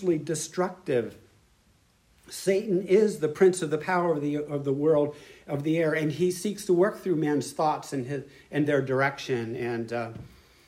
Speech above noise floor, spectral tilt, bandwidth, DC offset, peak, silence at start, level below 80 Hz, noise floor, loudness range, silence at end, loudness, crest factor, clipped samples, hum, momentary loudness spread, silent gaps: 37 dB; -6 dB/octave; 15.5 kHz; under 0.1%; -10 dBFS; 0 s; -64 dBFS; -63 dBFS; 3 LU; 0.4 s; -27 LUFS; 18 dB; under 0.1%; none; 11 LU; none